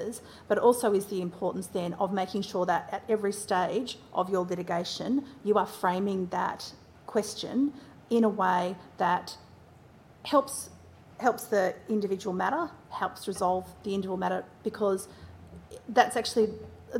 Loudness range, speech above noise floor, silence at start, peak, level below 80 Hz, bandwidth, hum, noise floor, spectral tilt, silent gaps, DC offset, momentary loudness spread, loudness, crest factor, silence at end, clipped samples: 2 LU; 25 dB; 0 s; -6 dBFS; -66 dBFS; 16.5 kHz; none; -54 dBFS; -5 dB/octave; none; under 0.1%; 13 LU; -29 LUFS; 22 dB; 0 s; under 0.1%